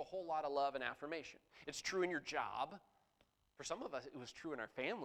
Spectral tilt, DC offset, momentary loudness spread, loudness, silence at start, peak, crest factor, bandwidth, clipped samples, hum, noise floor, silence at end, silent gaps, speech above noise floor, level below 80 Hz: -3 dB/octave; under 0.1%; 12 LU; -44 LUFS; 0 s; -24 dBFS; 22 dB; 15.5 kHz; under 0.1%; none; -79 dBFS; 0 s; none; 35 dB; -78 dBFS